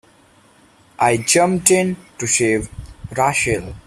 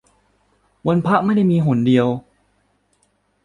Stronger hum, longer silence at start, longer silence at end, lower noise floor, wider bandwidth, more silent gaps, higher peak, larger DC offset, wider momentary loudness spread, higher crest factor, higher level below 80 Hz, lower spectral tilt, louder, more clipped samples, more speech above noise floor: second, none vs 50 Hz at -40 dBFS; first, 1 s vs 0.85 s; second, 0.05 s vs 1.25 s; second, -52 dBFS vs -64 dBFS; first, 15.5 kHz vs 10 kHz; neither; about the same, 0 dBFS vs -2 dBFS; neither; first, 12 LU vs 8 LU; about the same, 20 dB vs 16 dB; first, -44 dBFS vs -56 dBFS; second, -3.5 dB/octave vs -9 dB/octave; about the same, -17 LUFS vs -17 LUFS; neither; second, 34 dB vs 48 dB